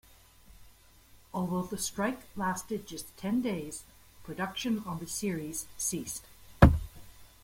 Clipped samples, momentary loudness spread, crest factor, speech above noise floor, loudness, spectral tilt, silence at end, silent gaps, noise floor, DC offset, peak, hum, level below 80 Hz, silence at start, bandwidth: under 0.1%; 19 LU; 30 dB; 23 dB; -32 LUFS; -5 dB/octave; 0.15 s; none; -58 dBFS; under 0.1%; -2 dBFS; none; -40 dBFS; 0.6 s; 16.5 kHz